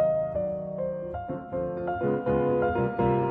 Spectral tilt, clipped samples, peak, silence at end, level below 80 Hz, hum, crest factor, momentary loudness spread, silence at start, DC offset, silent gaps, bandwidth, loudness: -11 dB/octave; under 0.1%; -12 dBFS; 0 s; -48 dBFS; none; 14 dB; 8 LU; 0 s; under 0.1%; none; 4.1 kHz; -28 LUFS